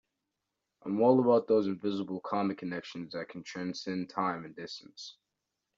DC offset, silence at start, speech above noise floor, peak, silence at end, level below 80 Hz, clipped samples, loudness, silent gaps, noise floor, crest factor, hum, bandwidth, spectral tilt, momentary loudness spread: under 0.1%; 0.85 s; 55 dB; -12 dBFS; 0.65 s; -78 dBFS; under 0.1%; -31 LUFS; none; -86 dBFS; 20 dB; none; 7.6 kHz; -5.5 dB/octave; 18 LU